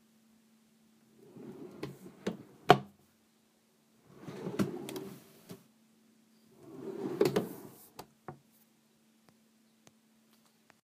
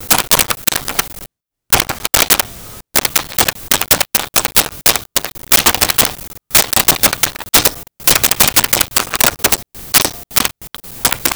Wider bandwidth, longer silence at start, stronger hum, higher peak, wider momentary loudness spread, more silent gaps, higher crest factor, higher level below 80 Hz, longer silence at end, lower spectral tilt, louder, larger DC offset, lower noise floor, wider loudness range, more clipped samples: second, 15.5 kHz vs over 20 kHz; first, 1.3 s vs 0 s; neither; second, -4 dBFS vs 0 dBFS; first, 27 LU vs 9 LU; neither; first, 36 dB vs 16 dB; second, -74 dBFS vs -36 dBFS; first, 2.65 s vs 0 s; first, -5.5 dB/octave vs -0.5 dB/octave; second, -35 LUFS vs -12 LUFS; second, under 0.1% vs 0.2%; first, -70 dBFS vs -40 dBFS; first, 9 LU vs 3 LU; neither